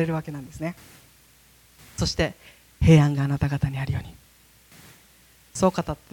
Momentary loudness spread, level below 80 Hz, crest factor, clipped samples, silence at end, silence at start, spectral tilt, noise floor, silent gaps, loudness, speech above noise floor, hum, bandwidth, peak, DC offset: 20 LU; -42 dBFS; 20 dB; under 0.1%; 0.2 s; 0 s; -6.5 dB/octave; -56 dBFS; none; -24 LUFS; 33 dB; none; 17.5 kHz; -6 dBFS; under 0.1%